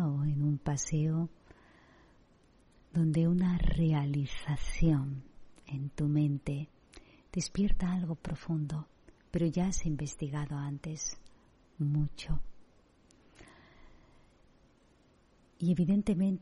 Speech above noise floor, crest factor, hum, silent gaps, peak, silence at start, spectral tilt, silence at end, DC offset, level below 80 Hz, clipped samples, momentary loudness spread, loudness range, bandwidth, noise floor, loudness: 34 dB; 16 dB; none; none; -16 dBFS; 0 s; -6.5 dB/octave; 0 s; under 0.1%; -42 dBFS; under 0.1%; 12 LU; 9 LU; 11 kHz; -65 dBFS; -33 LUFS